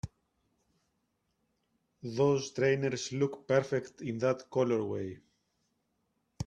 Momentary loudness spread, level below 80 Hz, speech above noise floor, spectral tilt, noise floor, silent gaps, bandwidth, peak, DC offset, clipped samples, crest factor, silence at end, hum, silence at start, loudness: 11 LU; -66 dBFS; 48 dB; -6 dB/octave; -79 dBFS; none; 9.4 kHz; -12 dBFS; under 0.1%; under 0.1%; 22 dB; 0 s; none; 0.05 s; -32 LUFS